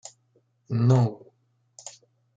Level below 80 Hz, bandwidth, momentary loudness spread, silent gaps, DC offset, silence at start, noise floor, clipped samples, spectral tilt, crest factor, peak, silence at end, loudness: -68 dBFS; 8 kHz; 25 LU; none; under 0.1%; 0.7 s; -67 dBFS; under 0.1%; -8 dB/octave; 18 dB; -8 dBFS; 0.45 s; -24 LUFS